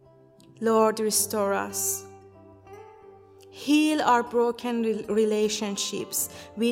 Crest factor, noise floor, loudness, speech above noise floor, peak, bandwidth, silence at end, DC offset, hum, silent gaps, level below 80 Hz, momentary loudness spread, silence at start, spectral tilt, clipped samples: 18 dB; -54 dBFS; -25 LUFS; 29 dB; -8 dBFS; 16.5 kHz; 0 s; under 0.1%; none; none; -68 dBFS; 7 LU; 0.6 s; -3 dB/octave; under 0.1%